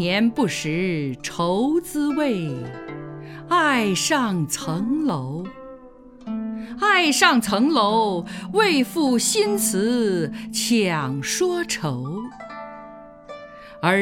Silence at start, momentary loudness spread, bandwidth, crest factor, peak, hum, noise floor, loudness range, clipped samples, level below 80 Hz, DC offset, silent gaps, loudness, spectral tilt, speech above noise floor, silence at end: 0 s; 18 LU; 18 kHz; 22 dB; -2 dBFS; none; -44 dBFS; 5 LU; under 0.1%; -56 dBFS; under 0.1%; none; -21 LUFS; -4 dB/octave; 23 dB; 0 s